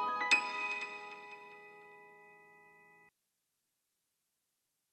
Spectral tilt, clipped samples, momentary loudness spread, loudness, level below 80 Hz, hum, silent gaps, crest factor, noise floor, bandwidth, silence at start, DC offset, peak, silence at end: 0 dB/octave; under 0.1%; 27 LU; -33 LUFS; under -90 dBFS; none; none; 26 dB; -85 dBFS; 13 kHz; 0 s; under 0.1%; -14 dBFS; 2.45 s